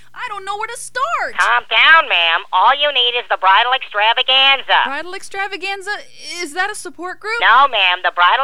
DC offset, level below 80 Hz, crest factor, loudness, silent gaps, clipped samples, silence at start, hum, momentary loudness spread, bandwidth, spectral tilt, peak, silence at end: 2%; -62 dBFS; 16 dB; -14 LUFS; none; under 0.1%; 0.15 s; none; 16 LU; 14 kHz; 0.5 dB/octave; 0 dBFS; 0 s